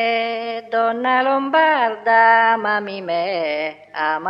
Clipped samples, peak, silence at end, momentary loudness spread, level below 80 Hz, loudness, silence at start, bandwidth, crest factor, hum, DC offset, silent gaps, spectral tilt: under 0.1%; -2 dBFS; 0 s; 11 LU; -78 dBFS; -18 LUFS; 0 s; 5.8 kHz; 16 dB; 50 Hz at -65 dBFS; under 0.1%; none; -6 dB/octave